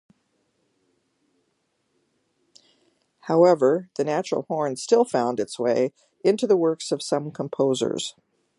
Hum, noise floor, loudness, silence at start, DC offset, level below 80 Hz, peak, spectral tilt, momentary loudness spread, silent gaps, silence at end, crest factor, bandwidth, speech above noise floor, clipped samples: none; -72 dBFS; -23 LUFS; 3.25 s; under 0.1%; -76 dBFS; -4 dBFS; -5 dB/octave; 9 LU; none; 0.5 s; 20 dB; 11.5 kHz; 50 dB; under 0.1%